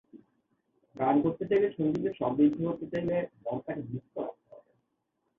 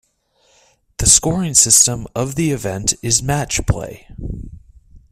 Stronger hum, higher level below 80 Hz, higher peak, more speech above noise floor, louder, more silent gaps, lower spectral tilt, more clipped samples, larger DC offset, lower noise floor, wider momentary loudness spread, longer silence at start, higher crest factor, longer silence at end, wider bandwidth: neither; second, -66 dBFS vs -34 dBFS; second, -14 dBFS vs 0 dBFS; first, 50 dB vs 43 dB; second, -30 LUFS vs -14 LUFS; neither; first, -9.5 dB/octave vs -3 dB/octave; neither; neither; first, -79 dBFS vs -60 dBFS; second, 12 LU vs 21 LU; second, 0.15 s vs 1 s; about the same, 18 dB vs 18 dB; first, 0.8 s vs 0.15 s; second, 5.4 kHz vs 16 kHz